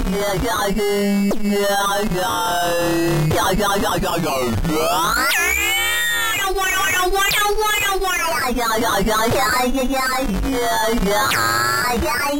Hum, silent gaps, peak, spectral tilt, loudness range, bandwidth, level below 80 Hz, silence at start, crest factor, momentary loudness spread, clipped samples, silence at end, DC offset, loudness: none; none; -8 dBFS; -3.5 dB/octave; 2 LU; 16.5 kHz; -32 dBFS; 0 s; 10 dB; 4 LU; under 0.1%; 0 s; under 0.1%; -18 LUFS